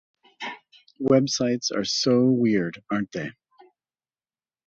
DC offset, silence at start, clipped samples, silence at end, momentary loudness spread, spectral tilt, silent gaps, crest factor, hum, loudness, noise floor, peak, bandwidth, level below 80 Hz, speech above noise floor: under 0.1%; 0.4 s; under 0.1%; 1.35 s; 16 LU; -5 dB/octave; none; 20 dB; none; -23 LUFS; under -90 dBFS; -6 dBFS; 7.8 kHz; -64 dBFS; over 67 dB